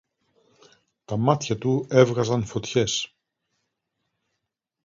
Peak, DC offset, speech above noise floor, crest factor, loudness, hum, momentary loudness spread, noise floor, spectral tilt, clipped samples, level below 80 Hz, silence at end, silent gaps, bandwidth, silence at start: -2 dBFS; under 0.1%; 59 dB; 24 dB; -23 LUFS; none; 9 LU; -82 dBFS; -5.5 dB/octave; under 0.1%; -58 dBFS; 1.8 s; none; 7.6 kHz; 1.1 s